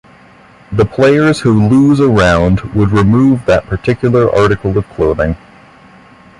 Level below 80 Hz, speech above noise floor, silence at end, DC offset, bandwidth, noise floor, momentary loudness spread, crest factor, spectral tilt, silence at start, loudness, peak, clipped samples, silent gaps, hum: -30 dBFS; 31 dB; 1.05 s; under 0.1%; 11.5 kHz; -41 dBFS; 8 LU; 12 dB; -7.5 dB/octave; 0.7 s; -11 LUFS; 0 dBFS; under 0.1%; none; none